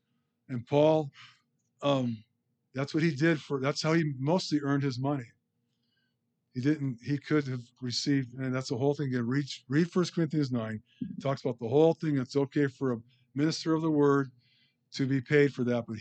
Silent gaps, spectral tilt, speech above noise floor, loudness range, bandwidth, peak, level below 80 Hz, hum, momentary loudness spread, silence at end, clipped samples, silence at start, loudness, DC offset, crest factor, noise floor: none; -6.5 dB/octave; 50 dB; 4 LU; 8.8 kHz; -12 dBFS; -76 dBFS; none; 13 LU; 0 s; under 0.1%; 0.5 s; -30 LUFS; under 0.1%; 18 dB; -79 dBFS